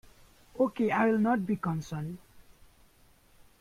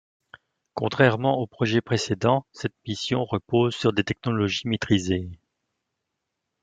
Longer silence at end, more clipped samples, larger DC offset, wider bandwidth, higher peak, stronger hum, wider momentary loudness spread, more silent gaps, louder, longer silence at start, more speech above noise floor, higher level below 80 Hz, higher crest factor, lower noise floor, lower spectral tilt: about the same, 1.2 s vs 1.3 s; neither; neither; first, 15 kHz vs 9.2 kHz; second, -14 dBFS vs -4 dBFS; neither; first, 16 LU vs 10 LU; neither; second, -30 LUFS vs -24 LUFS; second, 0.55 s vs 0.75 s; second, 33 dB vs 58 dB; about the same, -62 dBFS vs -60 dBFS; about the same, 18 dB vs 22 dB; second, -61 dBFS vs -81 dBFS; first, -7.5 dB/octave vs -6 dB/octave